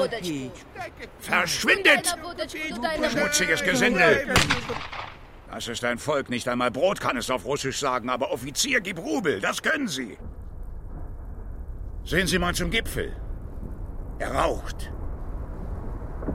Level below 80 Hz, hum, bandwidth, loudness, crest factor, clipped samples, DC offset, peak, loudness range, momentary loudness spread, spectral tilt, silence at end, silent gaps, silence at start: -38 dBFS; none; 16 kHz; -24 LUFS; 22 dB; under 0.1%; under 0.1%; -4 dBFS; 8 LU; 19 LU; -3.5 dB/octave; 0 s; none; 0 s